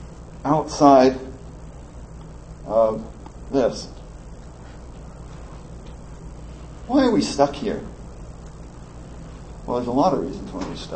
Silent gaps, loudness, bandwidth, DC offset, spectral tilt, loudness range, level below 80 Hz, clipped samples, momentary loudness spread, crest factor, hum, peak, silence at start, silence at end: none; -21 LUFS; 8.8 kHz; 0.2%; -6 dB/octave; 10 LU; -40 dBFS; under 0.1%; 23 LU; 22 dB; none; -2 dBFS; 0 s; 0 s